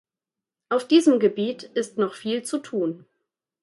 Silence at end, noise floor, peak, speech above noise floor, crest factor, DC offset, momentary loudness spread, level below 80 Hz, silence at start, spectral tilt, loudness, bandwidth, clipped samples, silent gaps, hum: 0.65 s; -89 dBFS; -6 dBFS; 67 dB; 18 dB; under 0.1%; 11 LU; -76 dBFS; 0.7 s; -5 dB/octave; -23 LUFS; 11.5 kHz; under 0.1%; none; none